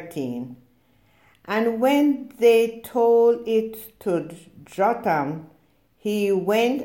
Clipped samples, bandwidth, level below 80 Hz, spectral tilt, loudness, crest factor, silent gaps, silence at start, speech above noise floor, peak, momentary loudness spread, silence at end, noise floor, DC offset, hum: under 0.1%; 17 kHz; -66 dBFS; -6 dB/octave; -22 LUFS; 16 dB; none; 0 s; 40 dB; -6 dBFS; 16 LU; 0 s; -61 dBFS; under 0.1%; none